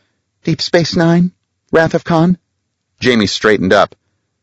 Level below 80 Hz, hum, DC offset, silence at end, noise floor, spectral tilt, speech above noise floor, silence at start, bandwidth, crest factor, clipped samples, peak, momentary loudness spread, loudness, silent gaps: -46 dBFS; none; under 0.1%; 0.55 s; -69 dBFS; -5.5 dB/octave; 58 dB; 0.45 s; 8.2 kHz; 14 dB; 0.2%; 0 dBFS; 7 LU; -13 LUFS; none